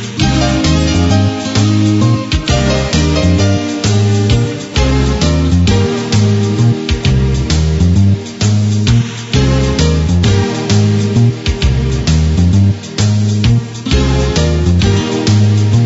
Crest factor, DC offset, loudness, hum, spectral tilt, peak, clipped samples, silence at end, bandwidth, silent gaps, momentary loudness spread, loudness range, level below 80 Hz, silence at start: 10 dB; under 0.1%; -12 LUFS; none; -6 dB/octave; 0 dBFS; under 0.1%; 0 s; 8 kHz; none; 3 LU; 1 LU; -20 dBFS; 0 s